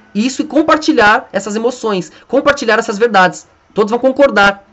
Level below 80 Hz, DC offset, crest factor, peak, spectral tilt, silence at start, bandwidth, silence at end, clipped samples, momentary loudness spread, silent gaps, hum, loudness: -46 dBFS; under 0.1%; 12 dB; 0 dBFS; -4 dB/octave; 0.15 s; 8.4 kHz; 0.15 s; under 0.1%; 9 LU; none; none; -12 LUFS